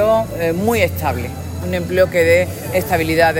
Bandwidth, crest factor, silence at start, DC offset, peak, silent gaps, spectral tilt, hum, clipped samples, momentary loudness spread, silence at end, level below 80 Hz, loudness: 17 kHz; 16 dB; 0 s; under 0.1%; 0 dBFS; none; -5.5 dB/octave; none; under 0.1%; 9 LU; 0 s; -42 dBFS; -17 LUFS